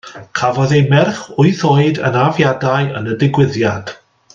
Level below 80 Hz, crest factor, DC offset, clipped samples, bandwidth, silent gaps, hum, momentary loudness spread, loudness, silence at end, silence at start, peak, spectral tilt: -50 dBFS; 14 dB; under 0.1%; under 0.1%; 7.6 kHz; none; none; 7 LU; -14 LUFS; 0.4 s; 0.05 s; 0 dBFS; -6.5 dB/octave